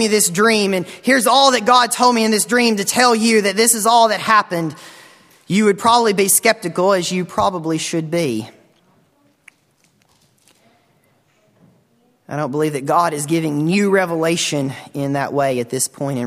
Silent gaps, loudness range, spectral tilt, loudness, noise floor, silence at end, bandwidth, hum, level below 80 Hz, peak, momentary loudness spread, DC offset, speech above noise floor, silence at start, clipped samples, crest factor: none; 12 LU; -3.5 dB/octave; -16 LUFS; -59 dBFS; 0 s; 16 kHz; none; -60 dBFS; 0 dBFS; 10 LU; under 0.1%; 43 dB; 0 s; under 0.1%; 18 dB